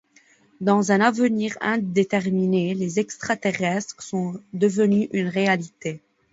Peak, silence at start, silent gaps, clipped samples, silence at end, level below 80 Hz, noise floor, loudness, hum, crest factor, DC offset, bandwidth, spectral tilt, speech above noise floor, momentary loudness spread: -4 dBFS; 0.6 s; none; under 0.1%; 0.35 s; -66 dBFS; -58 dBFS; -23 LUFS; none; 20 dB; under 0.1%; 8 kHz; -6 dB/octave; 36 dB; 10 LU